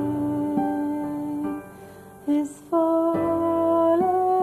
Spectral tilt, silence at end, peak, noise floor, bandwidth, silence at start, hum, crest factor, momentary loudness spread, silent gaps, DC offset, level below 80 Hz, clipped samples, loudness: -8 dB/octave; 0 s; -10 dBFS; -44 dBFS; 13.5 kHz; 0 s; none; 12 dB; 12 LU; none; under 0.1%; -60 dBFS; under 0.1%; -23 LUFS